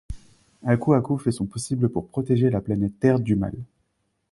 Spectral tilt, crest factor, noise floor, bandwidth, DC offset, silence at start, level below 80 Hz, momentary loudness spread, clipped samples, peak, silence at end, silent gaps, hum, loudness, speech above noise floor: -7.5 dB/octave; 18 dB; -72 dBFS; 11.5 kHz; under 0.1%; 0.1 s; -46 dBFS; 11 LU; under 0.1%; -6 dBFS; 0.7 s; none; none; -23 LUFS; 50 dB